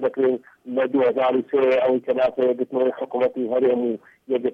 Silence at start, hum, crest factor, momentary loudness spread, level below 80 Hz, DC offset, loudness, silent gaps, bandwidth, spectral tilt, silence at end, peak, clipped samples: 0 s; none; 10 dB; 8 LU; -66 dBFS; under 0.1%; -22 LUFS; none; 5.2 kHz; -7.5 dB/octave; 0 s; -10 dBFS; under 0.1%